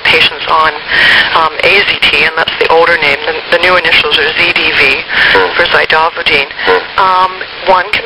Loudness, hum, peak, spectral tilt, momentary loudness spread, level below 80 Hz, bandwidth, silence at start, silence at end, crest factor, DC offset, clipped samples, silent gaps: -7 LUFS; none; 0 dBFS; -3 dB/octave; 4 LU; -38 dBFS; over 20 kHz; 0 s; 0 s; 8 dB; under 0.1%; 1%; none